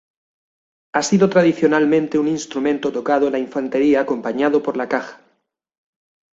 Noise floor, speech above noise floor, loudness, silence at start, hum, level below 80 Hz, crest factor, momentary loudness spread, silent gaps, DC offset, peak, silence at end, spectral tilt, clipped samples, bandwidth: -68 dBFS; 51 dB; -18 LUFS; 0.95 s; none; -62 dBFS; 18 dB; 8 LU; none; under 0.1%; -2 dBFS; 1.2 s; -5.5 dB/octave; under 0.1%; 8 kHz